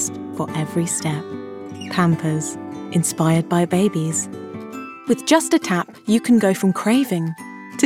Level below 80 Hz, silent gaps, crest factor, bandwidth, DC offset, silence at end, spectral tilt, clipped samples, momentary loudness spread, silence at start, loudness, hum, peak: -66 dBFS; none; 16 dB; 16 kHz; under 0.1%; 0 s; -5 dB/octave; under 0.1%; 16 LU; 0 s; -20 LUFS; none; -4 dBFS